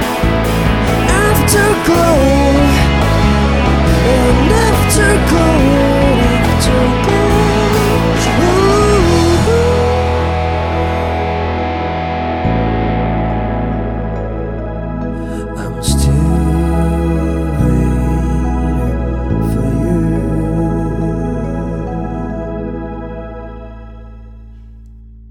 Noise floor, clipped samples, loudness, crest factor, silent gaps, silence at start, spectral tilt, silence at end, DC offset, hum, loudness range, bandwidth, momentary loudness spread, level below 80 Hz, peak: -35 dBFS; under 0.1%; -13 LUFS; 12 dB; none; 0 s; -6 dB/octave; 0 s; under 0.1%; none; 8 LU; 18 kHz; 11 LU; -20 dBFS; 0 dBFS